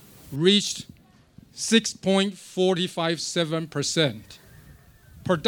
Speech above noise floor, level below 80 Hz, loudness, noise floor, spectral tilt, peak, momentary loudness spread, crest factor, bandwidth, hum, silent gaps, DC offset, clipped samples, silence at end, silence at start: 29 dB; -60 dBFS; -24 LUFS; -53 dBFS; -4 dB/octave; -4 dBFS; 17 LU; 22 dB; 19.5 kHz; none; none; under 0.1%; under 0.1%; 0 s; 0.25 s